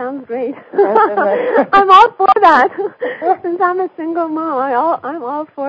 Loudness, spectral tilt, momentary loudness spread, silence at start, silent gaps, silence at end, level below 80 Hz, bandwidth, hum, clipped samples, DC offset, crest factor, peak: -13 LUFS; -5 dB/octave; 14 LU; 0 s; none; 0 s; -58 dBFS; 8 kHz; none; 0.6%; under 0.1%; 14 dB; 0 dBFS